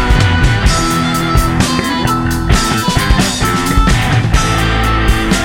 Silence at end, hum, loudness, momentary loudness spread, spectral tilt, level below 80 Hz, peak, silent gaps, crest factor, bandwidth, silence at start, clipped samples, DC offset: 0 s; none; -12 LUFS; 2 LU; -4.5 dB/octave; -16 dBFS; 0 dBFS; none; 10 dB; 17 kHz; 0 s; under 0.1%; under 0.1%